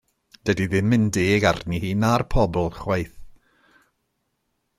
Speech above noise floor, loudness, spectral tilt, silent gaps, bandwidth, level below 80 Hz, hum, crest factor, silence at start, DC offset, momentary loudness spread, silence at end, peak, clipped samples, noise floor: 53 dB; -22 LUFS; -6 dB/octave; none; 15 kHz; -38 dBFS; none; 18 dB; 0.45 s; under 0.1%; 7 LU; 1.5 s; -4 dBFS; under 0.1%; -74 dBFS